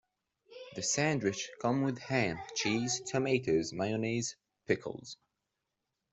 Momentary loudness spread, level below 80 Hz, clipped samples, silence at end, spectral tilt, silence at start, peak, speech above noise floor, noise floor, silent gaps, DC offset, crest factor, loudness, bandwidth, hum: 16 LU; -68 dBFS; under 0.1%; 1 s; -4 dB/octave; 0.5 s; -16 dBFS; 53 dB; -86 dBFS; none; under 0.1%; 20 dB; -33 LUFS; 8.2 kHz; none